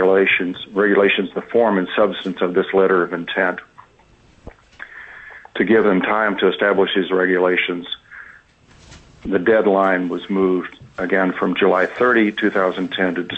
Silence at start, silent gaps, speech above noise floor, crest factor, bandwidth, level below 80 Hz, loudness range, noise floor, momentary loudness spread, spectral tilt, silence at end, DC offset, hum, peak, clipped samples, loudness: 0 s; none; 34 dB; 14 dB; 7.8 kHz; -54 dBFS; 4 LU; -52 dBFS; 17 LU; -7 dB/octave; 0 s; under 0.1%; none; -4 dBFS; under 0.1%; -17 LUFS